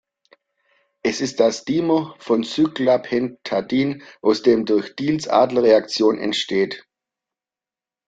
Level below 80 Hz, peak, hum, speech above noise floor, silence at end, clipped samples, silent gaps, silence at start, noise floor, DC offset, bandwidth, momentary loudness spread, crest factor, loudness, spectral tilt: -62 dBFS; -2 dBFS; none; over 71 dB; 1.25 s; under 0.1%; none; 1.05 s; under -90 dBFS; under 0.1%; 9 kHz; 8 LU; 18 dB; -20 LUFS; -5 dB/octave